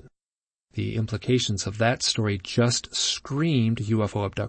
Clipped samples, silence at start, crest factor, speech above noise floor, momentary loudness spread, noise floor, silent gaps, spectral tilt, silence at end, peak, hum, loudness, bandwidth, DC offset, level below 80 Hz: under 0.1%; 0.75 s; 18 dB; over 65 dB; 6 LU; under -90 dBFS; none; -4.5 dB/octave; 0 s; -8 dBFS; none; -25 LUFS; 8.8 kHz; under 0.1%; -54 dBFS